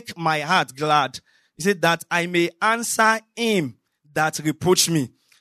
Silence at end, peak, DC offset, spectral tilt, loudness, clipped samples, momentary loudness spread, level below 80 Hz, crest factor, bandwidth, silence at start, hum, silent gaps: 0.3 s; -4 dBFS; under 0.1%; -3.5 dB/octave; -21 LUFS; under 0.1%; 8 LU; -62 dBFS; 18 dB; 13.5 kHz; 0.05 s; none; none